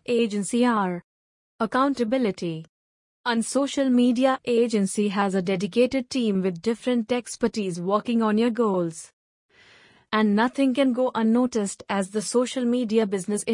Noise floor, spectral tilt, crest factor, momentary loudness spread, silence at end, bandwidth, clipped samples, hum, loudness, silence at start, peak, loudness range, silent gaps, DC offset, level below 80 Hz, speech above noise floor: -55 dBFS; -5 dB/octave; 16 dB; 6 LU; 0 s; 11 kHz; under 0.1%; none; -24 LUFS; 0.1 s; -8 dBFS; 3 LU; 1.04-1.59 s, 2.69-3.24 s, 9.13-9.49 s; under 0.1%; -66 dBFS; 32 dB